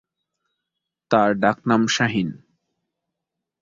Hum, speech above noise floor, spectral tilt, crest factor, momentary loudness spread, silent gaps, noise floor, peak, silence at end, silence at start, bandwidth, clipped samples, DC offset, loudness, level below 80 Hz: none; 64 dB; -5 dB/octave; 20 dB; 6 LU; none; -83 dBFS; -4 dBFS; 1.25 s; 1.1 s; 7.6 kHz; under 0.1%; under 0.1%; -20 LUFS; -60 dBFS